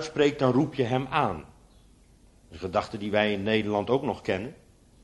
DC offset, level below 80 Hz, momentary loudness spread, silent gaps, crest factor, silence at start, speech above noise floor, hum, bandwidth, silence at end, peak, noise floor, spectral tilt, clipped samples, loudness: under 0.1%; -56 dBFS; 8 LU; none; 20 dB; 0 s; 31 dB; none; 11.5 kHz; 0.5 s; -8 dBFS; -57 dBFS; -6.5 dB/octave; under 0.1%; -27 LUFS